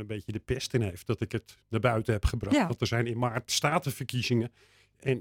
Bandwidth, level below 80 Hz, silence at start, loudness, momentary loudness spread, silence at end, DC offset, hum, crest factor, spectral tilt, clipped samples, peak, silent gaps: 17 kHz; -44 dBFS; 0 s; -30 LUFS; 9 LU; 0 s; under 0.1%; none; 18 dB; -5 dB/octave; under 0.1%; -12 dBFS; none